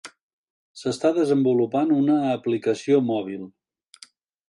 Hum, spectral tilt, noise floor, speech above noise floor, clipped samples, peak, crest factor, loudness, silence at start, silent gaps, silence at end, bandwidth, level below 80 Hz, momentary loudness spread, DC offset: none; -6.5 dB/octave; -52 dBFS; 31 dB; under 0.1%; -8 dBFS; 16 dB; -22 LUFS; 0.05 s; 0.21-0.75 s; 1 s; 11 kHz; -72 dBFS; 12 LU; under 0.1%